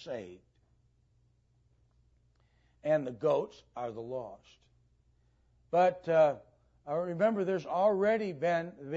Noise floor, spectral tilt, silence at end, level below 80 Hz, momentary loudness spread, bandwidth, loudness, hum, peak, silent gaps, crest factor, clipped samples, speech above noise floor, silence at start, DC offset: -70 dBFS; -7 dB/octave; 0 s; -72 dBFS; 16 LU; 7.8 kHz; -31 LUFS; none; -16 dBFS; none; 18 dB; under 0.1%; 39 dB; 0 s; under 0.1%